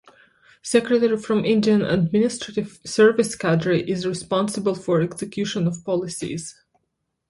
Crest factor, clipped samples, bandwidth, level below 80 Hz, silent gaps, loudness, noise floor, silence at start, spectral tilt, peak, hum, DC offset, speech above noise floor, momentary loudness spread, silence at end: 18 dB; under 0.1%; 11.5 kHz; -56 dBFS; none; -21 LUFS; -76 dBFS; 0.65 s; -5.5 dB/octave; -4 dBFS; none; under 0.1%; 55 dB; 11 LU; 0.8 s